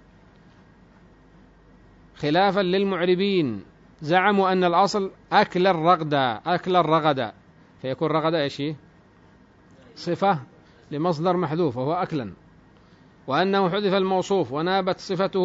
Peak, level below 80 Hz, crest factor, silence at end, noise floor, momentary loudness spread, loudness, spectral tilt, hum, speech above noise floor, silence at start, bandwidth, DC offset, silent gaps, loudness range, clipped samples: -4 dBFS; -60 dBFS; 20 dB; 0 s; -54 dBFS; 12 LU; -23 LUFS; -6.5 dB/octave; none; 32 dB; 2.2 s; 7.8 kHz; under 0.1%; none; 6 LU; under 0.1%